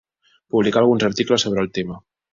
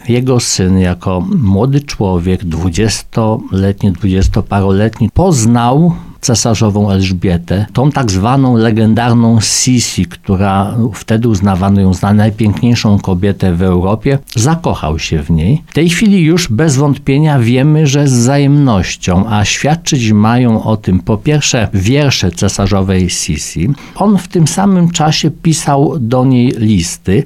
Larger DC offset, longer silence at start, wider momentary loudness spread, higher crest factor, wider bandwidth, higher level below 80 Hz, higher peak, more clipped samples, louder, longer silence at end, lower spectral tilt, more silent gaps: neither; first, 0.55 s vs 0.05 s; first, 12 LU vs 5 LU; first, 16 dB vs 10 dB; second, 7.6 kHz vs 15 kHz; second, -54 dBFS vs -30 dBFS; second, -4 dBFS vs 0 dBFS; neither; second, -19 LUFS vs -11 LUFS; first, 0.35 s vs 0 s; about the same, -5 dB/octave vs -5.5 dB/octave; neither